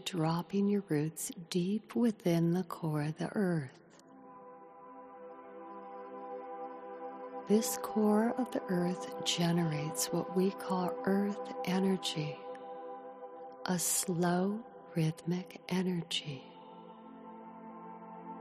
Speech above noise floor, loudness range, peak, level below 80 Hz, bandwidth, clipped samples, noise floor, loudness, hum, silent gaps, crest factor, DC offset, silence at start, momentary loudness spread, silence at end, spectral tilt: 23 dB; 8 LU; -16 dBFS; -76 dBFS; 14 kHz; under 0.1%; -56 dBFS; -34 LUFS; none; none; 18 dB; under 0.1%; 0 s; 20 LU; 0 s; -5 dB/octave